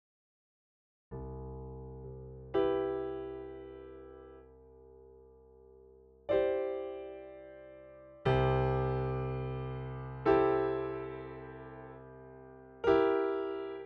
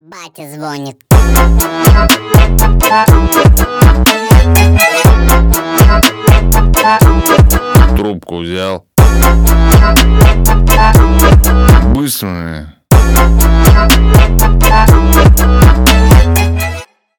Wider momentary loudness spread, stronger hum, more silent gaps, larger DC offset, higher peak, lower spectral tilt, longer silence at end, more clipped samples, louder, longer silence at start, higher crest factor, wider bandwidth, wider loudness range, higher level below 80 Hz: first, 23 LU vs 10 LU; neither; neither; neither; second, -14 dBFS vs 0 dBFS; first, -9 dB/octave vs -5 dB/octave; second, 0 s vs 0.35 s; second, under 0.1% vs 0.8%; second, -34 LUFS vs -8 LUFS; first, 1.1 s vs 0.15 s; first, 20 dB vs 6 dB; second, 5.6 kHz vs over 20 kHz; first, 7 LU vs 2 LU; second, -52 dBFS vs -10 dBFS